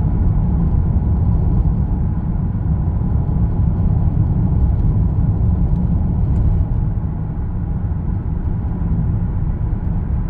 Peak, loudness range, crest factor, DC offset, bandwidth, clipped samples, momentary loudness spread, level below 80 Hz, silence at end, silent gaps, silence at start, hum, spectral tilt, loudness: -4 dBFS; 4 LU; 12 dB; under 0.1%; 2.5 kHz; under 0.1%; 5 LU; -20 dBFS; 0 s; none; 0 s; none; -13 dB/octave; -19 LUFS